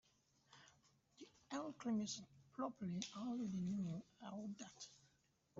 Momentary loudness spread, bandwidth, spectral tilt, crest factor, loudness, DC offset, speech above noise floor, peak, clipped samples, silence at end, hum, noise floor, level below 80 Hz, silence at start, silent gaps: 20 LU; 7.8 kHz; -6 dB/octave; 20 dB; -48 LUFS; under 0.1%; 33 dB; -28 dBFS; under 0.1%; 0 s; none; -80 dBFS; -82 dBFS; 0.5 s; none